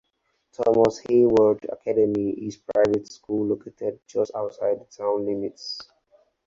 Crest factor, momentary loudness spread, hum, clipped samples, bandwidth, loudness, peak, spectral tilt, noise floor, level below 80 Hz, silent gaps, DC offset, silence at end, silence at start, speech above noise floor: 18 dB; 12 LU; none; under 0.1%; 7.6 kHz; -24 LUFS; -4 dBFS; -6.5 dB/octave; -73 dBFS; -60 dBFS; none; under 0.1%; 0.65 s; 0.6 s; 50 dB